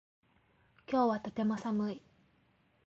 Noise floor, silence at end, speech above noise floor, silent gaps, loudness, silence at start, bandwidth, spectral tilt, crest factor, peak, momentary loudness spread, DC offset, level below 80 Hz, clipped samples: -71 dBFS; 0.9 s; 38 dB; none; -34 LUFS; 0.9 s; 7.6 kHz; -7.5 dB/octave; 18 dB; -18 dBFS; 8 LU; under 0.1%; -72 dBFS; under 0.1%